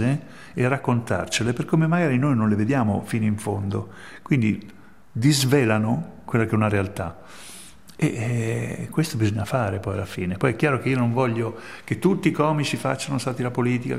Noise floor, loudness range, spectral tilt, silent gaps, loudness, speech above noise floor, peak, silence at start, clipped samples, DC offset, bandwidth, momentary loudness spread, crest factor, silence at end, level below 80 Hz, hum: -45 dBFS; 3 LU; -6 dB/octave; none; -23 LUFS; 22 dB; -4 dBFS; 0 s; under 0.1%; 0.4%; 15.5 kHz; 11 LU; 18 dB; 0 s; -56 dBFS; none